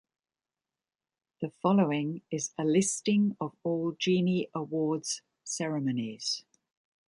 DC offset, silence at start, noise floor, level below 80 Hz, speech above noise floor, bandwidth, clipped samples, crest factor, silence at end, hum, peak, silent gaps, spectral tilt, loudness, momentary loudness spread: under 0.1%; 1.4 s; under -90 dBFS; -76 dBFS; over 61 dB; 11.5 kHz; under 0.1%; 18 dB; 0.65 s; none; -12 dBFS; none; -5 dB/octave; -30 LUFS; 9 LU